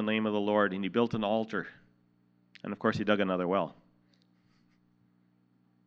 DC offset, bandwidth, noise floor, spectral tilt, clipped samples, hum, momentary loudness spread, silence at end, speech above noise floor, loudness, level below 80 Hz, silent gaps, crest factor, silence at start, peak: under 0.1%; 7.2 kHz; -69 dBFS; -7 dB/octave; under 0.1%; 60 Hz at -60 dBFS; 11 LU; 2.15 s; 39 dB; -30 LUFS; -72 dBFS; none; 22 dB; 0 s; -10 dBFS